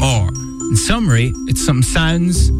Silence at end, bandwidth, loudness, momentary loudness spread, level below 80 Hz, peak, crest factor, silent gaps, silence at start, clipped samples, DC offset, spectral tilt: 0 s; 15.5 kHz; -15 LUFS; 4 LU; -22 dBFS; -2 dBFS; 12 dB; none; 0 s; under 0.1%; under 0.1%; -4.5 dB/octave